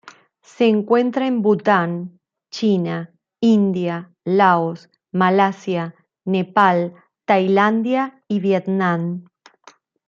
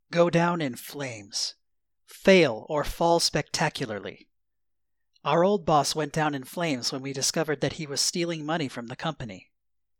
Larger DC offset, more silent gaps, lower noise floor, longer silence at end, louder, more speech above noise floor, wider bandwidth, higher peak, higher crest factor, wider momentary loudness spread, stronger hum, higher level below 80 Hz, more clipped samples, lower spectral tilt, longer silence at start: neither; neither; second, -51 dBFS vs -85 dBFS; first, 0.85 s vs 0.6 s; first, -19 LUFS vs -26 LUFS; second, 33 dB vs 59 dB; second, 7.4 kHz vs 18 kHz; first, -2 dBFS vs -6 dBFS; about the same, 18 dB vs 20 dB; about the same, 14 LU vs 12 LU; neither; second, -68 dBFS vs -52 dBFS; neither; first, -7.5 dB/octave vs -4 dB/octave; about the same, 0.05 s vs 0.1 s